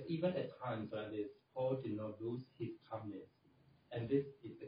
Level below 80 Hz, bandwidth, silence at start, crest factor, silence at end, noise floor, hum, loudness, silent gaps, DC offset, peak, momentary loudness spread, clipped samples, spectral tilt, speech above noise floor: -78 dBFS; 5 kHz; 0 s; 20 dB; 0 s; -70 dBFS; none; -43 LUFS; none; under 0.1%; -22 dBFS; 10 LU; under 0.1%; -7 dB/octave; 28 dB